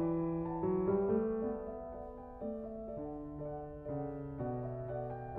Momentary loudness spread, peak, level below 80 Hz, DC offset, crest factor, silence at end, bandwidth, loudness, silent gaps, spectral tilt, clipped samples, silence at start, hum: 12 LU; -22 dBFS; -56 dBFS; under 0.1%; 16 dB; 0 s; 3.2 kHz; -39 LUFS; none; -11 dB/octave; under 0.1%; 0 s; none